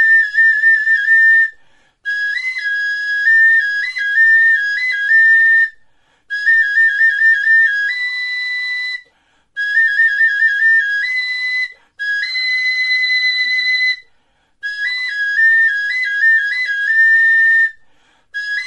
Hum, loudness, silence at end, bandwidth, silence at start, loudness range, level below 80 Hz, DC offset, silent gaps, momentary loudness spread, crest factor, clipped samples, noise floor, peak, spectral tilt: none; -12 LUFS; 0 s; 9.6 kHz; 0 s; 4 LU; -64 dBFS; under 0.1%; none; 11 LU; 10 dB; under 0.1%; -57 dBFS; -4 dBFS; 4 dB/octave